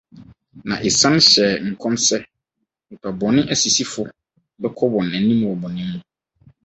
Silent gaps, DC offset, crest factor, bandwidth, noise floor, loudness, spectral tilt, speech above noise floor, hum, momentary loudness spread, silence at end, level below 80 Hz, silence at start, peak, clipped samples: none; under 0.1%; 20 dB; 8.4 kHz; -77 dBFS; -17 LUFS; -3 dB/octave; 59 dB; none; 18 LU; 0.65 s; -54 dBFS; 0.15 s; 0 dBFS; under 0.1%